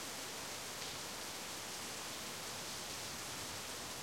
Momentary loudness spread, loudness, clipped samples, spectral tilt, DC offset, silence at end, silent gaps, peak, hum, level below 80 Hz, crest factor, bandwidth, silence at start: 1 LU; -43 LUFS; under 0.1%; -1 dB/octave; under 0.1%; 0 s; none; -30 dBFS; none; -70 dBFS; 16 dB; 16.5 kHz; 0 s